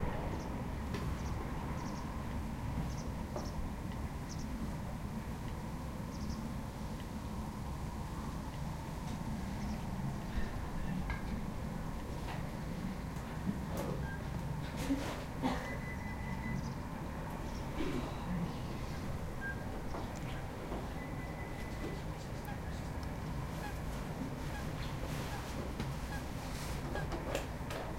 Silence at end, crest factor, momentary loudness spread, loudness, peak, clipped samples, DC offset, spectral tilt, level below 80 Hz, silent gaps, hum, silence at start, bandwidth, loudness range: 0 s; 18 dB; 4 LU; -41 LUFS; -22 dBFS; under 0.1%; under 0.1%; -6 dB/octave; -46 dBFS; none; none; 0 s; 16 kHz; 3 LU